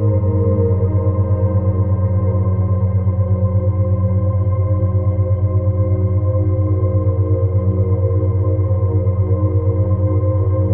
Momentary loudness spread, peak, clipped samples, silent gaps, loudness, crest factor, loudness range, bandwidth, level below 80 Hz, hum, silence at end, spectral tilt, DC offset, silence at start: 1 LU; -4 dBFS; under 0.1%; none; -17 LUFS; 10 dB; 0 LU; 2.2 kHz; -34 dBFS; none; 0 s; -15.5 dB/octave; under 0.1%; 0 s